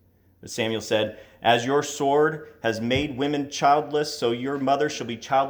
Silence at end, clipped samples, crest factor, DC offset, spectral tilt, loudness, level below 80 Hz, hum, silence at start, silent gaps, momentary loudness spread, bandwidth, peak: 0 s; under 0.1%; 20 dB; under 0.1%; -4.5 dB/octave; -24 LUFS; -56 dBFS; none; 0.45 s; none; 7 LU; over 20 kHz; -4 dBFS